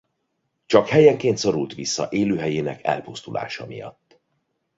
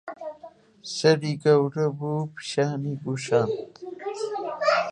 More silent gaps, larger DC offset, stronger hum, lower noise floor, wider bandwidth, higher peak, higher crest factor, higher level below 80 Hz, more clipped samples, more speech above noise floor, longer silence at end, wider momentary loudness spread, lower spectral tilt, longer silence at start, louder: neither; neither; neither; first, -74 dBFS vs -48 dBFS; second, 7.8 kHz vs 10.5 kHz; first, -2 dBFS vs -6 dBFS; about the same, 20 dB vs 20 dB; first, -58 dBFS vs -70 dBFS; neither; first, 54 dB vs 24 dB; first, 0.9 s vs 0 s; about the same, 17 LU vs 16 LU; about the same, -5 dB/octave vs -5.5 dB/octave; first, 0.7 s vs 0.05 s; first, -21 LUFS vs -25 LUFS